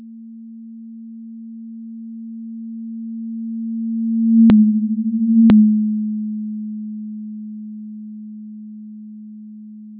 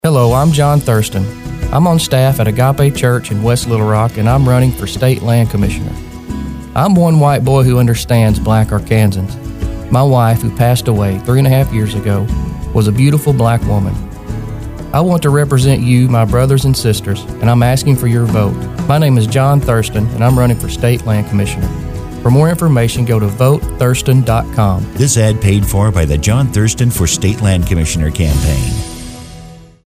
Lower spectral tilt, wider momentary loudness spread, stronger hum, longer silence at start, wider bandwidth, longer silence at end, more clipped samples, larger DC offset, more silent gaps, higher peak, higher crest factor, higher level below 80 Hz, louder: first, -12.5 dB/octave vs -6.5 dB/octave; first, 25 LU vs 10 LU; neither; about the same, 0 s vs 0.05 s; second, 4 kHz vs 16 kHz; second, 0 s vs 0.25 s; neither; neither; neither; second, -6 dBFS vs 0 dBFS; about the same, 14 dB vs 12 dB; second, -52 dBFS vs -24 dBFS; second, -17 LUFS vs -12 LUFS